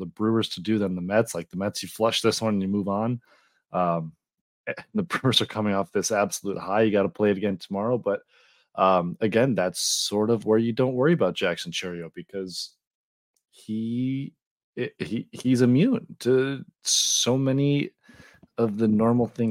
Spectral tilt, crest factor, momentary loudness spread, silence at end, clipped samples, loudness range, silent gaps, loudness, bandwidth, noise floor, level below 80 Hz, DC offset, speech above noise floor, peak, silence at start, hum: -4.5 dB/octave; 18 dB; 12 LU; 0 s; under 0.1%; 6 LU; 4.41-4.64 s, 12.87-13.34 s, 14.46-14.56 s, 14.64-14.73 s; -25 LUFS; 16.5 kHz; -53 dBFS; -66 dBFS; under 0.1%; 28 dB; -6 dBFS; 0 s; none